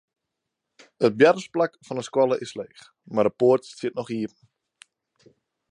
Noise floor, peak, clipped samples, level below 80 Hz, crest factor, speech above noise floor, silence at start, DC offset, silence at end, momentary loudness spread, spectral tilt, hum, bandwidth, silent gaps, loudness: -83 dBFS; -4 dBFS; under 0.1%; -70 dBFS; 22 dB; 60 dB; 1 s; under 0.1%; 1.45 s; 16 LU; -6 dB/octave; none; 10.5 kHz; none; -23 LUFS